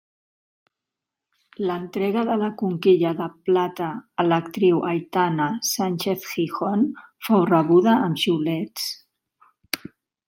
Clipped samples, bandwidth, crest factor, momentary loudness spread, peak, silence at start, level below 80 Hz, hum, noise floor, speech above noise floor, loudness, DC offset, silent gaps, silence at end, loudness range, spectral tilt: under 0.1%; 16.5 kHz; 20 dB; 11 LU; -4 dBFS; 1.6 s; -70 dBFS; none; -86 dBFS; 65 dB; -22 LUFS; under 0.1%; none; 0.5 s; 3 LU; -5.5 dB/octave